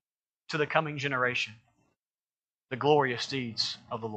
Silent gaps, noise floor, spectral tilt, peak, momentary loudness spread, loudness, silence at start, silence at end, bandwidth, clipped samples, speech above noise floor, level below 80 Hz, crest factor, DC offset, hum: 1.99-2.11 s, 2.55-2.59 s; under -90 dBFS; -4.5 dB/octave; -8 dBFS; 11 LU; -29 LUFS; 0.5 s; 0 s; 8.8 kHz; under 0.1%; over 60 dB; -76 dBFS; 24 dB; under 0.1%; none